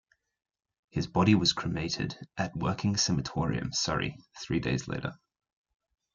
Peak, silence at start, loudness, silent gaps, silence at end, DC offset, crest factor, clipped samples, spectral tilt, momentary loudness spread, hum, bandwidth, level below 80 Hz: -10 dBFS; 0.95 s; -30 LUFS; none; 1 s; under 0.1%; 20 dB; under 0.1%; -4.5 dB/octave; 12 LU; none; 9.4 kHz; -54 dBFS